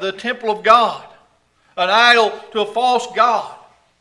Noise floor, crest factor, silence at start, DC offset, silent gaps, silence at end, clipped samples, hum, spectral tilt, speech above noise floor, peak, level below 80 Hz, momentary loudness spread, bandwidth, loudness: -58 dBFS; 18 dB; 0 s; under 0.1%; none; 0.45 s; under 0.1%; none; -2 dB/octave; 42 dB; 0 dBFS; -64 dBFS; 12 LU; 12 kHz; -15 LUFS